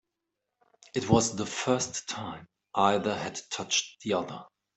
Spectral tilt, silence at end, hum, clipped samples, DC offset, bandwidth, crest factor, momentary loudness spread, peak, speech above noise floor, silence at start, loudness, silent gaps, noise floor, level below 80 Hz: -3.5 dB/octave; 0.3 s; none; under 0.1%; under 0.1%; 8.4 kHz; 22 dB; 13 LU; -10 dBFS; 56 dB; 0.95 s; -29 LUFS; none; -85 dBFS; -64 dBFS